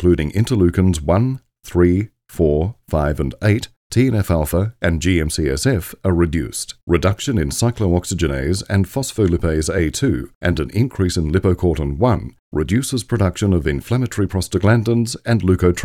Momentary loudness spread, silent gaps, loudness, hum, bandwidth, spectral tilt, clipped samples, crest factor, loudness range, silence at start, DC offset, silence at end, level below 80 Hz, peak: 5 LU; 3.76-3.90 s, 6.83-6.87 s, 10.35-10.41 s, 12.39-12.52 s; -18 LUFS; none; 16 kHz; -6 dB/octave; under 0.1%; 18 dB; 1 LU; 0 s; under 0.1%; 0 s; -30 dBFS; 0 dBFS